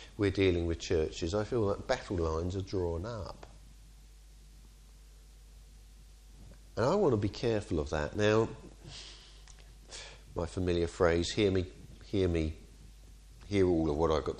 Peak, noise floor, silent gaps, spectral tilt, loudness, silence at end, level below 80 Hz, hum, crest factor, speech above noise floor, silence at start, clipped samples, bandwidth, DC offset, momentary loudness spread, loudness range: -12 dBFS; -54 dBFS; none; -6 dB/octave; -32 LUFS; 0 s; -48 dBFS; none; 20 dB; 24 dB; 0 s; under 0.1%; 11.5 kHz; under 0.1%; 18 LU; 8 LU